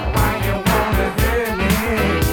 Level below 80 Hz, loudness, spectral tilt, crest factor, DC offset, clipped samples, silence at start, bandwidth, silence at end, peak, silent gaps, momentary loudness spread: -24 dBFS; -18 LUFS; -5.5 dB/octave; 14 dB; under 0.1%; under 0.1%; 0 s; 19 kHz; 0 s; -4 dBFS; none; 2 LU